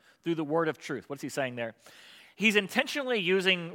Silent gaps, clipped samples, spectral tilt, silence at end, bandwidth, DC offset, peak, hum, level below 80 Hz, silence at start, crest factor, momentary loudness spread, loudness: none; under 0.1%; -4 dB/octave; 0 s; 17 kHz; under 0.1%; -8 dBFS; none; -84 dBFS; 0.25 s; 22 dB; 13 LU; -29 LUFS